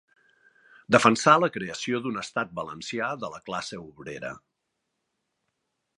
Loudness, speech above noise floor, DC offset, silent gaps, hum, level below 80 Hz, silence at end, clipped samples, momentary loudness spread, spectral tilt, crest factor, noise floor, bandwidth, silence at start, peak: -25 LUFS; 54 dB; under 0.1%; none; none; -66 dBFS; 1.6 s; under 0.1%; 19 LU; -4.5 dB/octave; 26 dB; -80 dBFS; 11.5 kHz; 0.9 s; -2 dBFS